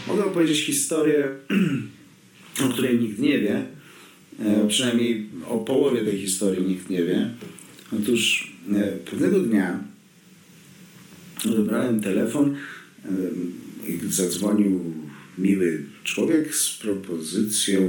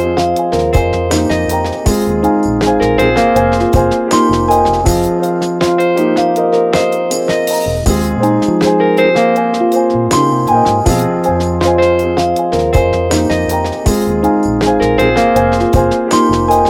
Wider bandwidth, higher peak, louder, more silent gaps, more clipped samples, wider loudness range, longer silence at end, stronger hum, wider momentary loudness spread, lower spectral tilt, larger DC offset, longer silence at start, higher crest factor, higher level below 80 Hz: about the same, 19 kHz vs 18 kHz; second, -8 dBFS vs 0 dBFS; second, -23 LUFS vs -13 LUFS; neither; neither; about the same, 3 LU vs 1 LU; about the same, 0 s vs 0 s; neither; first, 13 LU vs 4 LU; second, -4 dB/octave vs -6 dB/octave; neither; about the same, 0 s vs 0 s; about the same, 16 dB vs 12 dB; second, -70 dBFS vs -24 dBFS